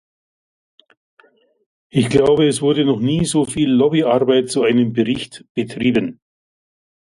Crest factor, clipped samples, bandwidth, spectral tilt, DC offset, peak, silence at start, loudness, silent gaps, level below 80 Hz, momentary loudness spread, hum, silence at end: 18 dB; under 0.1%; 11.5 kHz; -5.5 dB/octave; under 0.1%; 0 dBFS; 1.95 s; -17 LUFS; 5.49-5.55 s; -50 dBFS; 9 LU; none; 0.9 s